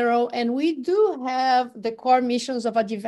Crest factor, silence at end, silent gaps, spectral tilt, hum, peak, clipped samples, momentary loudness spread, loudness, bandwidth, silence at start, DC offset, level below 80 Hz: 14 dB; 0 s; none; -4.5 dB/octave; none; -8 dBFS; under 0.1%; 4 LU; -22 LUFS; 12 kHz; 0 s; under 0.1%; -72 dBFS